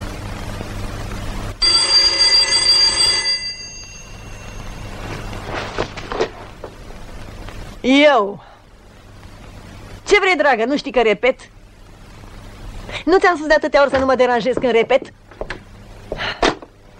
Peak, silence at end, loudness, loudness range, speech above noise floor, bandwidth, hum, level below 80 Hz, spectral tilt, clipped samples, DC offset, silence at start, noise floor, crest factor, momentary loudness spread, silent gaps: -2 dBFS; 0.35 s; -15 LUFS; 14 LU; 28 dB; 14 kHz; none; -36 dBFS; -2.5 dB/octave; under 0.1%; under 0.1%; 0 s; -43 dBFS; 18 dB; 24 LU; none